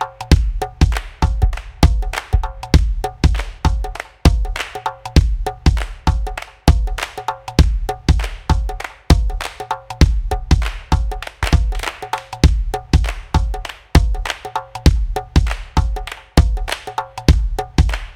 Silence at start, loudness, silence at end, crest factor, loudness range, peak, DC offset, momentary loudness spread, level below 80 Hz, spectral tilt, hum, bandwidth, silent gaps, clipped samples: 0 s; -19 LUFS; 0.05 s; 16 dB; 1 LU; 0 dBFS; under 0.1%; 8 LU; -18 dBFS; -5.5 dB/octave; none; 15.5 kHz; none; 0.2%